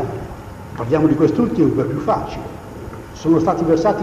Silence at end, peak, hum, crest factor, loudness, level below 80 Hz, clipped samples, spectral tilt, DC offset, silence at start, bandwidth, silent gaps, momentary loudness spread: 0 s; -4 dBFS; none; 14 dB; -18 LUFS; -40 dBFS; under 0.1%; -8 dB/octave; under 0.1%; 0 s; 13.5 kHz; none; 17 LU